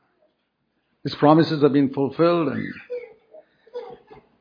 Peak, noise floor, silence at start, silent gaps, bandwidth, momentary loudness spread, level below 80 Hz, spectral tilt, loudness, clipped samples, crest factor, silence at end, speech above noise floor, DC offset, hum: -2 dBFS; -72 dBFS; 1.05 s; none; 5.2 kHz; 21 LU; -66 dBFS; -9 dB/octave; -20 LUFS; under 0.1%; 20 dB; 0.25 s; 53 dB; under 0.1%; none